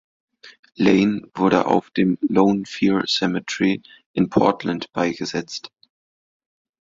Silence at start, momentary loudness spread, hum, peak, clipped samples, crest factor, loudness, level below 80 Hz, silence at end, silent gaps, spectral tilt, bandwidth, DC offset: 0.45 s; 9 LU; none; -2 dBFS; under 0.1%; 20 dB; -20 LUFS; -56 dBFS; 1.15 s; 0.59-0.63 s, 4.06-4.14 s; -5.5 dB/octave; 7.6 kHz; under 0.1%